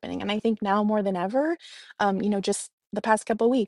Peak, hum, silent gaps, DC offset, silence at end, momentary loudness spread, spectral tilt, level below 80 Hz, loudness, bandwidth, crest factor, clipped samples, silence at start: -8 dBFS; none; 2.73-2.78 s; under 0.1%; 0 s; 8 LU; -5 dB/octave; -66 dBFS; -26 LUFS; 12 kHz; 18 dB; under 0.1%; 0.05 s